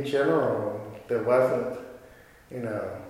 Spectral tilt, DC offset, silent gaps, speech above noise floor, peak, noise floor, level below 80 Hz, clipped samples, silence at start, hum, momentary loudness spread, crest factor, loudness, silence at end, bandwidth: -7 dB/octave; under 0.1%; none; 26 dB; -8 dBFS; -52 dBFS; -62 dBFS; under 0.1%; 0 s; none; 17 LU; 20 dB; -27 LUFS; 0 s; 16 kHz